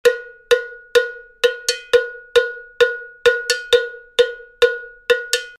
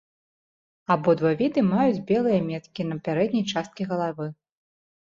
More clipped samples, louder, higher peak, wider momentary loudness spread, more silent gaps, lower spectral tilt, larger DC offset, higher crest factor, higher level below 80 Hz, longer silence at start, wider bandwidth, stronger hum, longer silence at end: neither; first, -19 LUFS vs -24 LUFS; first, -2 dBFS vs -6 dBFS; second, 5 LU vs 10 LU; neither; second, 0.5 dB/octave vs -7 dB/octave; neither; about the same, 16 dB vs 18 dB; first, -56 dBFS vs -64 dBFS; second, 0.05 s vs 0.9 s; first, 15 kHz vs 7.6 kHz; neither; second, 0.1 s vs 0.8 s